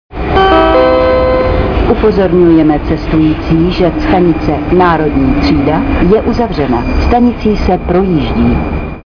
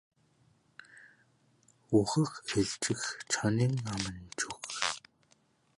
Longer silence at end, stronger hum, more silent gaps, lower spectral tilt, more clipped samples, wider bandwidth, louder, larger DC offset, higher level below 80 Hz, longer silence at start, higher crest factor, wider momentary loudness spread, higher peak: second, 0.05 s vs 0.8 s; neither; neither; first, -8.5 dB/octave vs -4.5 dB/octave; neither; second, 5.4 kHz vs 11.5 kHz; first, -10 LUFS vs -32 LUFS; neither; first, -18 dBFS vs -62 dBFS; second, 0.1 s vs 0.95 s; second, 8 dB vs 22 dB; second, 6 LU vs 9 LU; first, 0 dBFS vs -12 dBFS